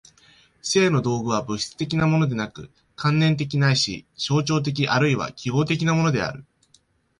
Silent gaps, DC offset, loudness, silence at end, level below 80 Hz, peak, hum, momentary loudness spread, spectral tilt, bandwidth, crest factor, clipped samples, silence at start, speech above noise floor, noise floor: none; under 0.1%; -22 LUFS; 0.8 s; -54 dBFS; -6 dBFS; none; 10 LU; -5.5 dB/octave; 11 kHz; 16 dB; under 0.1%; 0.65 s; 40 dB; -61 dBFS